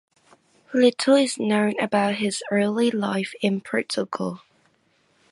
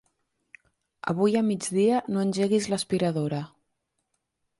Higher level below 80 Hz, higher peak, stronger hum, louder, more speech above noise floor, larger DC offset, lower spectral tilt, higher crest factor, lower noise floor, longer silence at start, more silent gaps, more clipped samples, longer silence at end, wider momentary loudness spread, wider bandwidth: second, -72 dBFS vs -66 dBFS; first, -6 dBFS vs -12 dBFS; neither; first, -23 LUFS vs -26 LUFS; second, 42 dB vs 54 dB; neither; about the same, -4.5 dB/octave vs -5.5 dB/octave; about the same, 18 dB vs 16 dB; second, -64 dBFS vs -79 dBFS; second, 0.7 s vs 1.05 s; neither; neither; second, 0.95 s vs 1.15 s; about the same, 9 LU vs 9 LU; about the same, 11.5 kHz vs 11.5 kHz